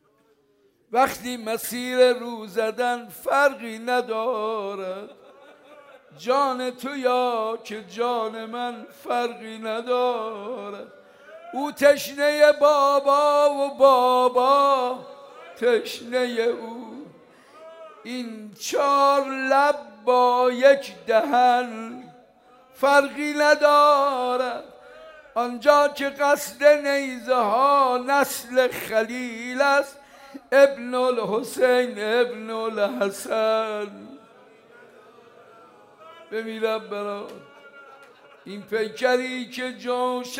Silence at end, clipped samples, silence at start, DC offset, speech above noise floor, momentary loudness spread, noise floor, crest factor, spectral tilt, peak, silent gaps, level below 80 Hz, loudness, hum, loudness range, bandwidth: 0 s; under 0.1%; 0.9 s; under 0.1%; 41 dB; 15 LU; -63 dBFS; 20 dB; -3 dB/octave; -2 dBFS; none; -72 dBFS; -22 LUFS; none; 9 LU; 16 kHz